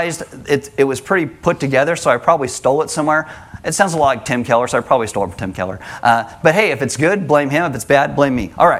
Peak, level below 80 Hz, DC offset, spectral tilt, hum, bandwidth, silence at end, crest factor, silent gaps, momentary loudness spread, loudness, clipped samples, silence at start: 0 dBFS; -46 dBFS; under 0.1%; -4.5 dB/octave; none; 15.5 kHz; 0 s; 16 dB; none; 8 LU; -16 LUFS; under 0.1%; 0 s